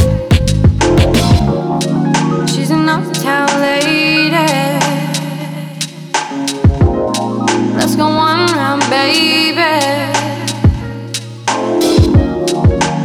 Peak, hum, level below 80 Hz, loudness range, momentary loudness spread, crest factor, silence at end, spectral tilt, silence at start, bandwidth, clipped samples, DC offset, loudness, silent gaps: 0 dBFS; none; -24 dBFS; 3 LU; 8 LU; 12 dB; 0 s; -5 dB/octave; 0 s; 19 kHz; under 0.1%; under 0.1%; -13 LUFS; none